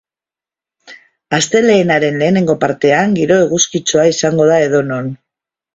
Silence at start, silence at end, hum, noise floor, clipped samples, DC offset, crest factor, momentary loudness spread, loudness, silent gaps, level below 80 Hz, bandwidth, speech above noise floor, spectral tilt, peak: 0.9 s; 0.6 s; none; -89 dBFS; under 0.1%; under 0.1%; 14 dB; 5 LU; -12 LUFS; none; -52 dBFS; 8 kHz; 77 dB; -4.5 dB/octave; 0 dBFS